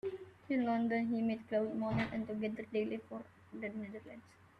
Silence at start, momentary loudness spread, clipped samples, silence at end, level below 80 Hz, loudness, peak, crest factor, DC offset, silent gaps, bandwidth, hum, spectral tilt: 0.05 s; 17 LU; under 0.1%; 0.4 s; -68 dBFS; -38 LUFS; -24 dBFS; 14 dB; under 0.1%; none; 6 kHz; none; -8 dB/octave